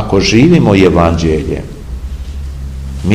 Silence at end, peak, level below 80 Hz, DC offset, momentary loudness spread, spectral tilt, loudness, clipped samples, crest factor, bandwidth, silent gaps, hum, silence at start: 0 s; 0 dBFS; -22 dBFS; 0.5%; 17 LU; -6.5 dB/octave; -10 LUFS; 1%; 12 dB; 11.5 kHz; none; none; 0 s